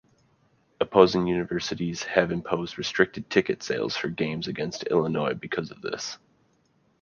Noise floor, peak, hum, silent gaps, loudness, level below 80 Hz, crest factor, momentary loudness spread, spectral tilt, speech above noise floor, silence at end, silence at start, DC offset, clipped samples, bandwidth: -66 dBFS; -2 dBFS; none; none; -26 LUFS; -58 dBFS; 24 dB; 12 LU; -5 dB/octave; 41 dB; 0.85 s; 0.8 s; under 0.1%; under 0.1%; 7.2 kHz